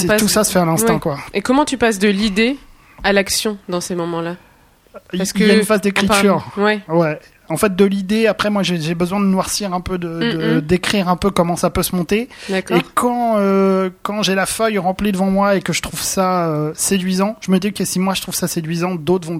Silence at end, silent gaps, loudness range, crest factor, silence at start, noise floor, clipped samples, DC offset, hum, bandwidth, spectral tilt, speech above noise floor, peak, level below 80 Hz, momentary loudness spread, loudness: 0 s; none; 2 LU; 16 dB; 0 s; -49 dBFS; under 0.1%; under 0.1%; none; 16.5 kHz; -4.5 dB/octave; 33 dB; 0 dBFS; -42 dBFS; 8 LU; -17 LUFS